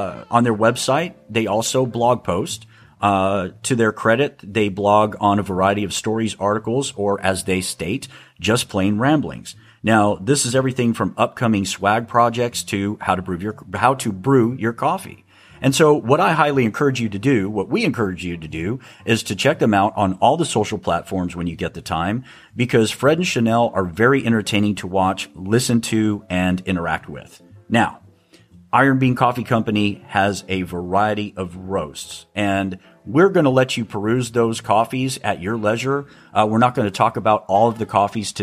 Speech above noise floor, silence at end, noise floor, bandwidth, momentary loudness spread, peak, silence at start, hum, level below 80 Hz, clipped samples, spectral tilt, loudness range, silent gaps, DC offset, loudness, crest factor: 32 dB; 0 s; -50 dBFS; 15.5 kHz; 9 LU; -2 dBFS; 0 s; none; -52 dBFS; under 0.1%; -5 dB/octave; 3 LU; none; under 0.1%; -19 LUFS; 18 dB